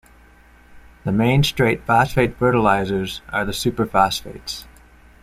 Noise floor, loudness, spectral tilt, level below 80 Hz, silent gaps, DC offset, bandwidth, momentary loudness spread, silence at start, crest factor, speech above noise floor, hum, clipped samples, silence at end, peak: -49 dBFS; -19 LUFS; -5.5 dB/octave; -42 dBFS; none; under 0.1%; 16 kHz; 14 LU; 0.7 s; 18 dB; 30 dB; none; under 0.1%; 0.6 s; -2 dBFS